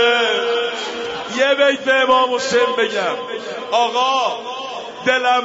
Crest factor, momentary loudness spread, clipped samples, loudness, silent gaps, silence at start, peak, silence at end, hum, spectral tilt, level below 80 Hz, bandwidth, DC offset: 14 dB; 12 LU; under 0.1%; -17 LUFS; none; 0 s; -4 dBFS; 0 s; none; -2 dB/octave; -64 dBFS; 8 kHz; under 0.1%